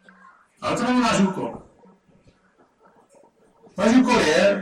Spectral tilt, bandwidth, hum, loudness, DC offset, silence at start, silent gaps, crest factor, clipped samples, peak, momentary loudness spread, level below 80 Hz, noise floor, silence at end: -5 dB/octave; 12 kHz; none; -20 LUFS; under 0.1%; 0.6 s; none; 18 dB; under 0.1%; -6 dBFS; 16 LU; -54 dBFS; -60 dBFS; 0 s